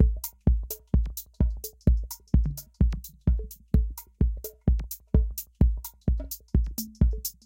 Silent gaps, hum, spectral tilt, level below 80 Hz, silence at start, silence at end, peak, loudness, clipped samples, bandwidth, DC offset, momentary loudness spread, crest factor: none; none; -7 dB/octave; -28 dBFS; 0 s; 0.15 s; -8 dBFS; -29 LUFS; under 0.1%; 17 kHz; under 0.1%; 6 LU; 18 dB